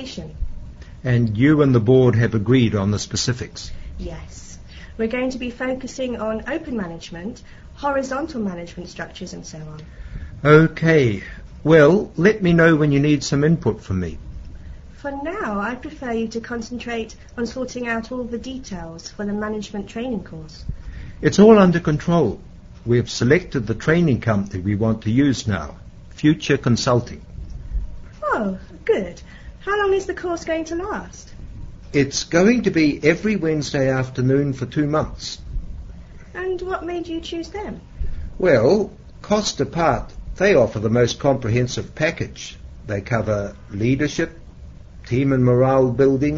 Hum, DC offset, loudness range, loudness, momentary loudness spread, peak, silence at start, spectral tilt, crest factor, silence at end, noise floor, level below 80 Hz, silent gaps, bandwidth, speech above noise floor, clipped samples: none; under 0.1%; 10 LU; -20 LUFS; 20 LU; 0 dBFS; 0 s; -6.5 dB/octave; 20 dB; 0 s; -39 dBFS; -38 dBFS; none; 8 kHz; 20 dB; under 0.1%